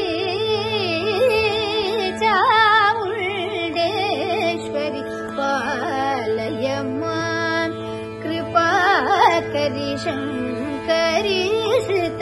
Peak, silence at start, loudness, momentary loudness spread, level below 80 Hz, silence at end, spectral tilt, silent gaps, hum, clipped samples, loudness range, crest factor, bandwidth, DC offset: -2 dBFS; 0 s; -20 LUFS; 9 LU; -52 dBFS; 0 s; -4.5 dB/octave; none; none; under 0.1%; 5 LU; 18 dB; 12.5 kHz; under 0.1%